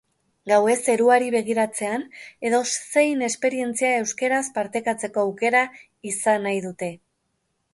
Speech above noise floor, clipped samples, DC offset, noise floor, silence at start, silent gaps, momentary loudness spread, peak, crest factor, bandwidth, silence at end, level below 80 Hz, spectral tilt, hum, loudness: 51 dB; under 0.1%; under 0.1%; -73 dBFS; 0.45 s; none; 11 LU; -6 dBFS; 18 dB; 11.5 kHz; 0.75 s; -72 dBFS; -3 dB/octave; none; -22 LUFS